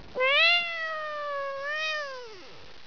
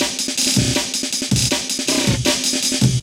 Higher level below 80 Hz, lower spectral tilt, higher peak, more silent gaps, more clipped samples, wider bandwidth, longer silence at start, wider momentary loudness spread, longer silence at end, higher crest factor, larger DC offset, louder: second, -66 dBFS vs -38 dBFS; second, -1 dB/octave vs -3 dB/octave; second, -12 dBFS vs -2 dBFS; neither; neither; second, 5.4 kHz vs 17 kHz; about the same, 0 s vs 0 s; first, 21 LU vs 3 LU; about the same, 0 s vs 0 s; about the same, 16 dB vs 16 dB; first, 0.4% vs under 0.1%; second, -25 LUFS vs -17 LUFS